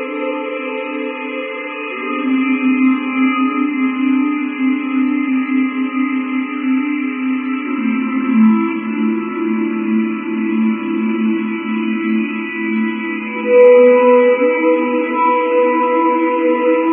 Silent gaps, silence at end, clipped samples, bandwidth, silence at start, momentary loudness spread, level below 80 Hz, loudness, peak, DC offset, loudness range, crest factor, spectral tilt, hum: none; 0 s; under 0.1%; 3.5 kHz; 0 s; 10 LU; -82 dBFS; -16 LUFS; 0 dBFS; under 0.1%; 6 LU; 16 dB; -10 dB/octave; none